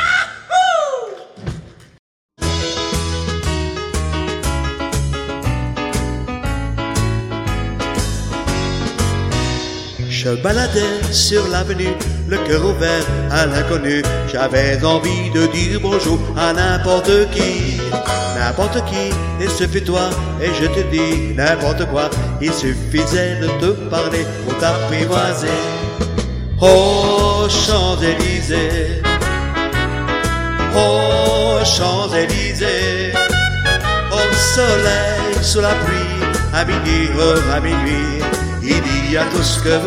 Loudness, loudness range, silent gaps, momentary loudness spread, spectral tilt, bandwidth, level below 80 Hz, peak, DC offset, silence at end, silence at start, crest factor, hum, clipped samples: -16 LUFS; 6 LU; 1.99-2.29 s; 8 LU; -4.5 dB/octave; 16 kHz; -26 dBFS; 0 dBFS; under 0.1%; 0 s; 0 s; 16 dB; none; under 0.1%